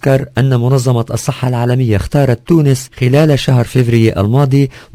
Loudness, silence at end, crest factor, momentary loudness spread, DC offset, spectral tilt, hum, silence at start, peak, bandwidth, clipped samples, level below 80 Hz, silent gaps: -12 LUFS; 0.15 s; 12 dB; 4 LU; under 0.1%; -7 dB/octave; none; 0.05 s; 0 dBFS; 16 kHz; 0.2%; -34 dBFS; none